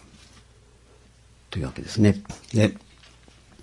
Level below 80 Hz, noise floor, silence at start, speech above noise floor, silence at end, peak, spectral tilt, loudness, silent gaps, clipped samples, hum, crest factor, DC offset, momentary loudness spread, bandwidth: -50 dBFS; -54 dBFS; 1.5 s; 31 dB; 0.85 s; -4 dBFS; -6.5 dB/octave; -25 LUFS; none; under 0.1%; none; 24 dB; under 0.1%; 13 LU; 11.5 kHz